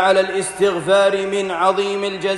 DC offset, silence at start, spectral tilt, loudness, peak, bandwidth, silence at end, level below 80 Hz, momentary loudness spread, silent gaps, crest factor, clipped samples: under 0.1%; 0 s; -3.5 dB/octave; -18 LUFS; -2 dBFS; 12 kHz; 0 s; -56 dBFS; 6 LU; none; 16 dB; under 0.1%